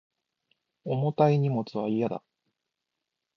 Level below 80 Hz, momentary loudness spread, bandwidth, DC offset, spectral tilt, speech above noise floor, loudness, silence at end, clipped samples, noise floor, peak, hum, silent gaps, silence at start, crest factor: -72 dBFS; 12 LU; 6.2 kHz; under 0.1%; -9.5 dB/octave; 59 dB; -27 LUFS; 1.2 s; under 0.1%; -85 dBFS; -8 dBFS; none; none; 0.85 s; 22 dB